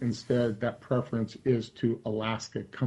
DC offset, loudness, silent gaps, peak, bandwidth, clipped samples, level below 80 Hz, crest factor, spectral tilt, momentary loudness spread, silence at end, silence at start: under 0.1%; -31 LUFS; none; -14 dBFS; 11 kHz; under 0.1%; -62 dBFS; 16 dB; -7 dB/octave; 5 LU; 0 s; 0 s